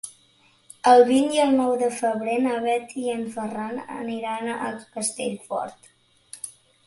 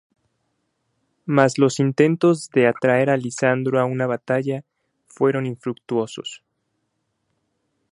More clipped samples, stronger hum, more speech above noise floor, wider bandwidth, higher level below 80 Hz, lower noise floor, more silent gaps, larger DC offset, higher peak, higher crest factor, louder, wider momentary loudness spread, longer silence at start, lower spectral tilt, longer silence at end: neither; neither; second, 37 dB vs 54 dB; about the same, 11.5 kHz vs 11.5 kHz; about the same, -68 dBFS vs -68 dBFS; second, -59 dBFS vs -73 dBFS; neither; neither; second, -4 dBFS vs 0 dBFS; about the same, 20 dB vs 22 dB; second, -23 LUFS vs -20 LUFS; first, 20 LU vs 12 LU; second, 0.05 s vs 1.25 s; second, -3.5 dB/octave vs -6 dB/octave; second, 0.35 s vs 1.55 s